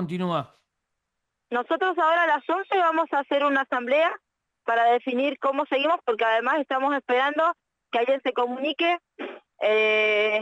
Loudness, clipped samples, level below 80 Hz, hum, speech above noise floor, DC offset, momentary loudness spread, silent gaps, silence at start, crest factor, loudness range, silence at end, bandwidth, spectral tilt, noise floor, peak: -23 LUFS; under 0.1%; -78 dBFS; none; 58 dB; under 0.1%; 9 LU; none; 0 s; 14 dB; 2 LU; 0 s; 9 kHz; -5.5 dB/octave; -82 dBFS; -12 dBFS